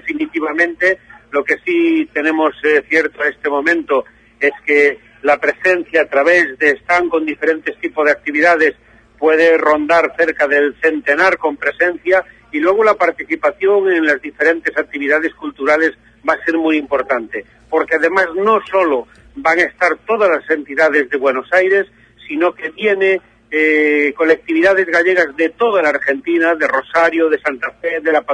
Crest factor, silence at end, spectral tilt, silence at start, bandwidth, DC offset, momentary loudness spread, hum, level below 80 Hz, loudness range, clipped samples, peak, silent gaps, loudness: 14 dB; 0 s; -4.5 dB/octave; 0.05 s; 10 kHz; under 0.1%; 7 LU; none; -54 dBFS; 2 LU; under 0.1%; 0 dBFS; none; -14 LUFS